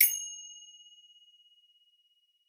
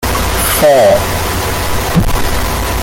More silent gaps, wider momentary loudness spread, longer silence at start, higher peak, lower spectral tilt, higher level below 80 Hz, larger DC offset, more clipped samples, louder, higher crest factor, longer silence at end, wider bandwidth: neither; first, 26 LU vs 8 LU; about the same, 0 s vs 0 s; second, -6 dBFS vs 0 dBFS; second, 11.5 dB/octave vs -4 dB/octave; second, under -90 dBFS vs -20 dBFS; neither; neither; second, -31 LUFS vs -12 LUFS; first, 30 dB vs 12 dB; first, 1.85 s vs 0 s; first, over 20 kHz vs 17 kHz